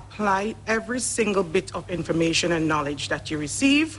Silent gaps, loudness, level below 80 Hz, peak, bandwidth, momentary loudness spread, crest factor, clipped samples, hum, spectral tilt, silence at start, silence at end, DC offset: none; -24 LUFS; -48 dBFS; -8 dBFS; 11.5 kHz; 7 LU; 16 dB; under 0.1%; none; -4 dB/octave; 0 s; 0 s; under 0.1%